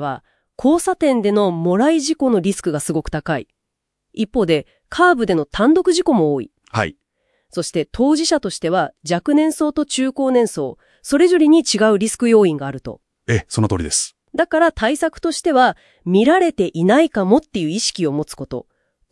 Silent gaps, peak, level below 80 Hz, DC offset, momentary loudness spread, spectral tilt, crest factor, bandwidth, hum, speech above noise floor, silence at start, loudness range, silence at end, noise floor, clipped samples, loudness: none; 0 dBFS; -46 dBFS; under 0.1%; 12 LU; -5 dB/octave; 16 dB; 12 kHz; none; 61 dB; 0 s; 4 LU; 0.5 s; -78 dBFS; under 0.1%; -17 LUFS